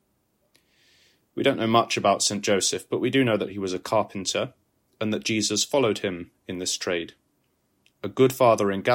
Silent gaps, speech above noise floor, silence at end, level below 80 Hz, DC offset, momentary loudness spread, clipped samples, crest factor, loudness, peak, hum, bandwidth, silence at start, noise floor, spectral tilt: none; 47 dB; 0 s; -66 dBFS; under 0.1%; 13 LU; under 0.1%; 20 dB; -24 LUFS; -6 dBFS; none; 16.5 kHz; 1.35 s; -70 dBFS; -3.5 dB/octave